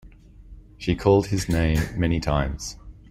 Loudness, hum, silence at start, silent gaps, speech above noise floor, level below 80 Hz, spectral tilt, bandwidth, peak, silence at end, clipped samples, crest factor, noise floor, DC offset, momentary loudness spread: -23 LUFS; none; 0.05 s; none; 24 dB; -34 dBFS; -6 dB/octave; 16 kHz; -6 dBFS; 0.2 s; under 0.1%; 18 dB; -46 dBFS; under 0.1%; 14 LU